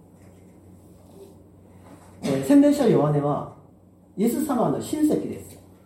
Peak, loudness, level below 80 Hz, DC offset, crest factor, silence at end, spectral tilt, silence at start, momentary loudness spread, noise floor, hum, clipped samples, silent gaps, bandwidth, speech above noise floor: -8 dBFS; -22 LUFS; -60 dBFS; under 0.1%; 18 dB; 0.3 s; -7 dB/octave; 1.2 s; 17 LU; -53 dBFS; none; under 0.1%; none; 16.5 kHz; 32 dB